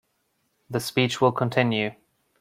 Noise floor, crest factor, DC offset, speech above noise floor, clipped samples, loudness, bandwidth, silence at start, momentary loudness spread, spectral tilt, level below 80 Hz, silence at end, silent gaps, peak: -72 dBFS; 20 dB; under 0.1%; 49 dB; under 0.1%; -24 LUFS; 16 kHz; 0.7 s; 9 LU; -5.5 dB/octave; -64 dBFS; 0.5 s; none; -6 dBFS